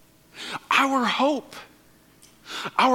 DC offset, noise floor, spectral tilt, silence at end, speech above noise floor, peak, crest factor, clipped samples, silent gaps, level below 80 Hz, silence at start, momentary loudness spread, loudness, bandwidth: under 0.1%; -56 dBFS; -3 dB/octave; 0 s; 33 dB; -4 dBFS; 20 dB; under 0.1%; none; -68 dBFS; 0.35 s; 19 LU; -23 LUFS; 17 kHz